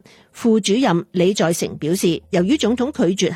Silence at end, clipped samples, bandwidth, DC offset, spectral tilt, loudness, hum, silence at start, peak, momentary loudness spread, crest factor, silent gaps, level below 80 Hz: 0 s; under 0.1%; 16 kHz; under 0.1%; -5 dB/octave; -18 LUFS; none; 0.35 s; -6 dBFS; 4 LU; 12 dB; none; -54 dBFS